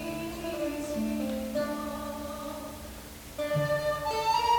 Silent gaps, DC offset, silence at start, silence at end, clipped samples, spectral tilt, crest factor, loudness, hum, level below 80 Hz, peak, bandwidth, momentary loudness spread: none; under 0.1%; 0 s; 0 s; under 0.1%; -5 dB/octave; 16 dB; -32 LUFS; none; -50 dBFS; -14 dBFS; over 20 kHz; 13 LU